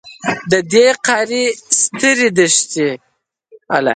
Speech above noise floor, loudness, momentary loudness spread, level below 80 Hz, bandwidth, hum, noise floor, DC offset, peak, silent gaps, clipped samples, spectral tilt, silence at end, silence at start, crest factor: 33 dB; -14 LUFS; 9 LU; -58 dBFS; 9.6 kHz; none; -47 dBFS; under 0.1%; 0 dBFS; none; under 0.1%; -2.5 dB/octave; 0 s; 0.05 s; 16 dB